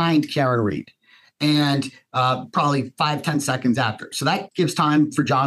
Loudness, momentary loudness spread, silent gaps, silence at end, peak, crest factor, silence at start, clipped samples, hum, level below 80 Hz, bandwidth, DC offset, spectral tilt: -21 LUFS; 6 LU; none; 0 s; -6 dBFS; 16 dB; 0 s; under 0.1%; none; -64 dBFS; 13 kHz; under 0.1%; -5.5 dB/octave